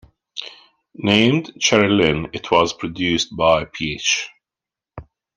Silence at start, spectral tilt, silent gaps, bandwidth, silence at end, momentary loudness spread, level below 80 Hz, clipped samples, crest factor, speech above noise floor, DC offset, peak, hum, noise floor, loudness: 0.35 s; -4 dB/octave; none; 10.5 kHz; 0.35 s; 17 LU; -48 dBFS; under 0.1%; 20 dB; 70 dB; under 0.1%; 0 dBFS; none; -88 dBFS; -18 LUFS